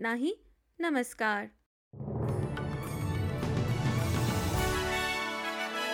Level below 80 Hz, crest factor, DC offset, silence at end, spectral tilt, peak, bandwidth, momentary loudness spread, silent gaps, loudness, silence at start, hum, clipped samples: -48 dBFS; 14 dB; under 0.1%; 0 s; -5 dB/octave; -18 dBFS; 17 kHz; 6 LU; 1.66-1.91 s; -32 LUFS; 0 s; none; under 0.1%